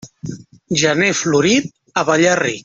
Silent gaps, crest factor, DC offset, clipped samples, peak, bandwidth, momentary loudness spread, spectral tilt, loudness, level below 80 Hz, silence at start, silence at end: none; 14 dB; under 0.1%; under 0.1%; -2 dBFS; 8 kHz; 16 LU; -3.5 dB/octave; -15 LUFS; -54 dBFS; 0.05 s; 0.05 s